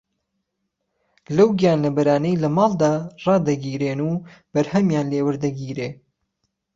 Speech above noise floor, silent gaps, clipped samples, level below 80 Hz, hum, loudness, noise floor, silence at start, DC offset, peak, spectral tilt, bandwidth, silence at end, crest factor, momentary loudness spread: 57 dB; none; under 0.1%; -58 dBFS; none; -20 LUFS; -77 dBFS; 1.3 s; under 0.1%; -4 dBFS; -7.5 dB/octave; 7.6 kHz; 0.8 s; 18 dB; 9 LU